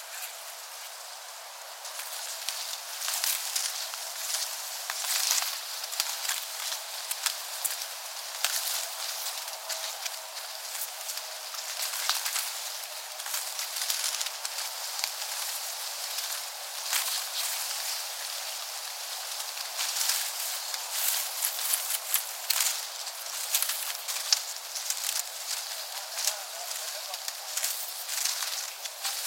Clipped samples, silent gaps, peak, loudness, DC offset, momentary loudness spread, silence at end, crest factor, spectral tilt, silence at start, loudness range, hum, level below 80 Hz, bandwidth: under 0.1%; none; -2 dBFS; -30 LUFS; under 0.1%; 8 LU; 0 s; 32 dB; 8 dB/octave; 0 s; 4 LU; none; under -90 dBFS; 17 kHz